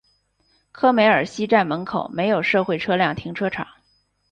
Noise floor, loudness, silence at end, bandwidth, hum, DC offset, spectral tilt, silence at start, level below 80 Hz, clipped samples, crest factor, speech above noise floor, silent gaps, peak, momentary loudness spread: -65 dBFS; -20 LUFS; 0.7 s; 9.6 kHz; 50 Hz at -55 dBFS; under 0.1%; -6 dB/octave; 0.75 s; -58 dBFS; under 0.1%; 18 dB; 45 dB; none; -4 dBFS; 10 LU